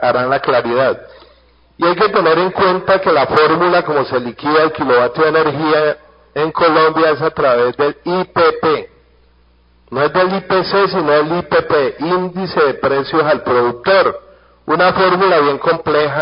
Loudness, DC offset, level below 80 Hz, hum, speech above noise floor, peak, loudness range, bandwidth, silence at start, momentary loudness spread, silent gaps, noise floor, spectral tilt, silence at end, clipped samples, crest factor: -14 LUFS; under 0.1%; -48 dBFS; none; 37 dB; 0 dBFS; 3 LU; 5.4 kHz; 0 s; 7 LU; none; -51 dBFS; -8.5 dB/octave; 0 s; under 0.1%; 14 dB